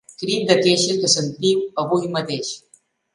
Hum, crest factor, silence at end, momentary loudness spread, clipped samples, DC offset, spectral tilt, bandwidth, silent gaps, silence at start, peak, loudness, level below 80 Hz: none; 20 dB; 0.55 s; 10 LU; under 0.1%; under 0.1%; -3.5 dB/octave; 11.5 kHz; none; 0.1 s; 0 dBFS; -19 LUFS; -64 dBFS